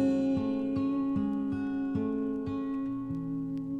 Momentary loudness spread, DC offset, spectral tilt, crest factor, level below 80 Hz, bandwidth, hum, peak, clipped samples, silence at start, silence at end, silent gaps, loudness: 5 LU; under 0.1%; -9 dB/octave; 12 dB; -58 dBFS; 4.8 kHz; none; -18 dBFS; under 0.1%; 0 s; 0 s; none; -32 LUFS